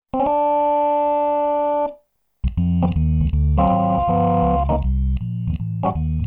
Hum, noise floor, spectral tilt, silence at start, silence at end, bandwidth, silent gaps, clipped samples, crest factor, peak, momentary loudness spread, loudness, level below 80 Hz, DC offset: none; -53 dBFS; -12 dB/octave; 0.15 s; 0 s; 3.7 kHz; none; under 0.1%; 14 dB; -4 dBFS; 7 LU; -20 LUFS; -26 dBFS; under 0.1%